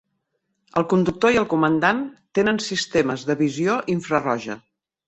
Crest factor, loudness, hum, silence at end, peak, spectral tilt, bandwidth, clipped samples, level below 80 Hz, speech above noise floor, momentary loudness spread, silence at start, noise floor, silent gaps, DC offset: 18 dB; -21 LUFS; none; 0.5 s; -4 dBFS; -5.5 dB/octave; 8.4 kHz; under 0.1%; -54 dBFS; 53 dB; 8 LU; 0.75 s; -74 dBFS; none; under 0.1%